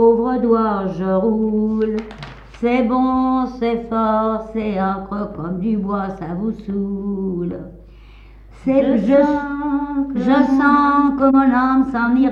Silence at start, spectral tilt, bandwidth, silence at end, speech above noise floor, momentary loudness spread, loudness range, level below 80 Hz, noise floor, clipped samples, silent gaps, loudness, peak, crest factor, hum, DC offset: 0 s; -8.5 dB/octave; 6.4 kHz; 0 s; 24 dB; 11 LU; 8 LU; -42 dBFS; -41 dBFS; under 0.1%; none; -18 LUFS; -2 dBFS; 16 dB; none; under 0.1%